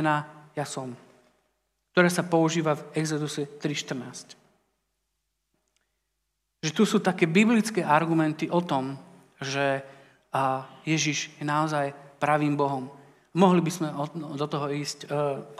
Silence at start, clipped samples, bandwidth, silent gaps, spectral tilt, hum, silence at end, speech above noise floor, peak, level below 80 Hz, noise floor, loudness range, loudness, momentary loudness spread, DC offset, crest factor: 0 s; under 0.1%; 14.5 kHz; none; -5 dB/octave; none; 0 s; 53 dB; -6 dBFS; -78 dBFS; -79 dBFS; 8 LU; -26 LUFS; 13 LU; under 0.1%; 22 dB